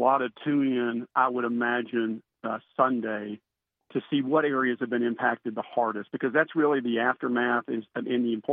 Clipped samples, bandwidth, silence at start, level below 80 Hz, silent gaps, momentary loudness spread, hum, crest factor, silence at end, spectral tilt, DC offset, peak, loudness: under 0.1%; 3.9 kHz; 0 s; -82 dBFS; none; 9 LU; none; 20 dB; 0 s; -9 dB/octave; under 0.1%; -8 dBFS; -27 LUFS